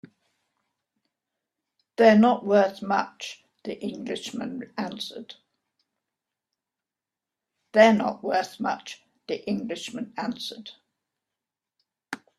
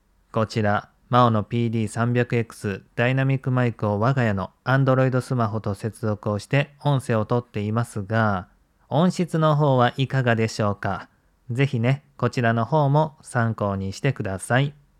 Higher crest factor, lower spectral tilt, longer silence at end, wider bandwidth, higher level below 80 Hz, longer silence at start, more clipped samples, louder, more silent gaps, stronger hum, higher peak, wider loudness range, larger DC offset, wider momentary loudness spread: about the same, 24 dB vs 20 dB; second, -5.5 dB/octave vs -7 dB/octave; about the same, 0.25 s vs 0.3 s; about the same, 13 kHz vs 12.5 kHz; second, -72 dBFS vs -60 dBFS; first, 2 s vs 0.35 s; neither; about the same, -24 LUFS vs -23 LUFS; neither; neither; about the same, -2 dBFS vs -2 dBFS; first, 12 LU vs 2 LU; neither; first, 22 LU vs 8 LU